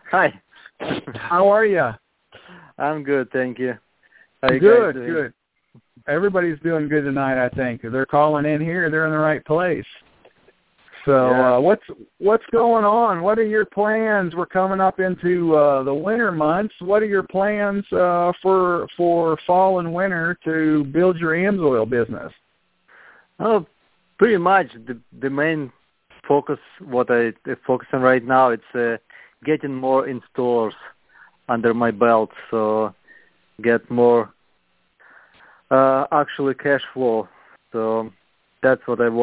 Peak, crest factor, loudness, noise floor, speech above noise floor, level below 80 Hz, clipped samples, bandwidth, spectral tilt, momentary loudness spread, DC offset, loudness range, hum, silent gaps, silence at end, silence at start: 0 dBFS; 18 dB; -19 LUFS; -66 dBFS; 47 dB; -58 dBFS; under 0.1%; 4 kHz; -10.5 dB/octave; 11 LU; under 0.1%; 4 LU; none; none; 0 s; 0.05 s